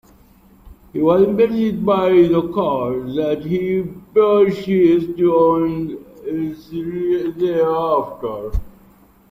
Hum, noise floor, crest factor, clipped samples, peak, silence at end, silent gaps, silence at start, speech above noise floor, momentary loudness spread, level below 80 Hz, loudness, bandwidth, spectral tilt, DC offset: none; -49 dBFS; 14 dB; under 0.1%; -2 dBFS; 0.6 s; none; 0.65 s; 33 dB; 13 LU; -38 dBFS; -18 LUFS; 15.5 kHz; -9 dB/octave; under 0.1%